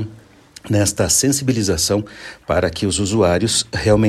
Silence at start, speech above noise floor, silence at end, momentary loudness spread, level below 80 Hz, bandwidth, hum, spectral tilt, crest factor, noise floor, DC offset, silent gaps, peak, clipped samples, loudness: 0 s; 27 dB; 0 s; 7 LU; -38 dBFS; 14.5 kHz; none; -4 dB/octave; 16 dB; -44 dBFS; under 0.1%; none; -2 dBFS; under 0.1%; -17 LUFS